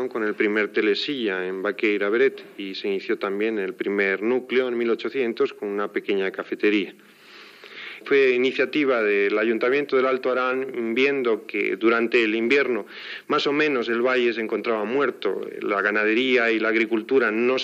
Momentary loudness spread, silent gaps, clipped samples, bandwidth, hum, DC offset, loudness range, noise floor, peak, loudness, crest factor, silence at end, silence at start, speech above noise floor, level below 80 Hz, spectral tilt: 8 LU; none; under 0.1%; 7.6 kHz; none; under 0.1%; 3 LU; -46 dBFS; -6 dBFS; -22 LUFS; 16 dB; 0 s; 0 s; 23 dB; -88 dBFS; -5.5 dB/octave